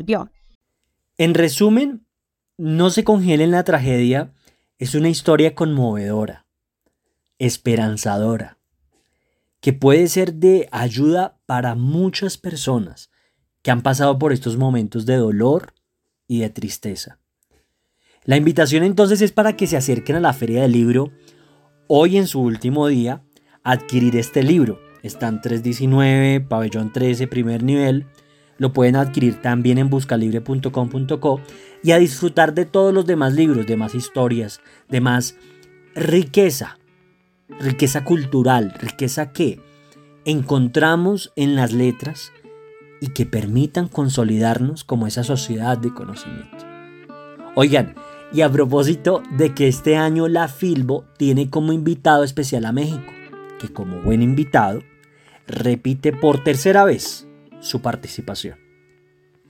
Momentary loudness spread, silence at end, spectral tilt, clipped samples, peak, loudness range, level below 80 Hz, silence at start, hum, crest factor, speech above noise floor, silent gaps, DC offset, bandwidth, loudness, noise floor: 14 LU; 0.95 s; -6 dB/octave; under 0.1%; 0 dBFS; 4 LU; -50 dBFS; 0 s; none; 18 dB; 64 dB; 0.55-0.61 s; under 0.1%; 17 kHz; -18 LUFS; -81 dBFS